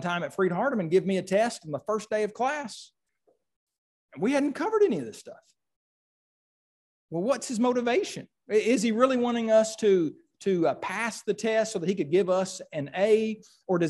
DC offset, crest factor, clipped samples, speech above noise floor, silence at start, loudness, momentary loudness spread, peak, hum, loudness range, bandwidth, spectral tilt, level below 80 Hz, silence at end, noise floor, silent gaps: under 0.1%; 18 dB; under 0.1%; 45 dB; 0 s; -27 LUFS; 10 LU; -10 dBFS; none; 6 LU; 12.5 kHz; -5 dB/octave; -74 dBFS; 0 s; -71 dBFS; 3.56-3.67 s, 3.78-4.09 s, 5.76-7.09 s